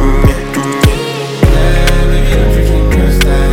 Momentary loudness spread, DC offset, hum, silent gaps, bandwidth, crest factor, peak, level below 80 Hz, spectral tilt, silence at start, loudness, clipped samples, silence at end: 5 LU; under 0.1%; none; none; 16.5 kHz; 8 dB; 0 dBFS; -10 dBFS; -6 dB/octave; 0 s; -11 LUFS; 0.2%; 0 s